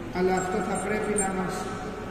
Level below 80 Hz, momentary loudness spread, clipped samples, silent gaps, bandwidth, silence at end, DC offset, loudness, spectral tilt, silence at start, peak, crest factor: -46 dBFS; 7 LU; under 0.1%; none; 14.5 kHz; 0 s; under 0.1%; -28 LUFS; -4.5 dB/octave; 0 s; -14 dBFS; 14 dB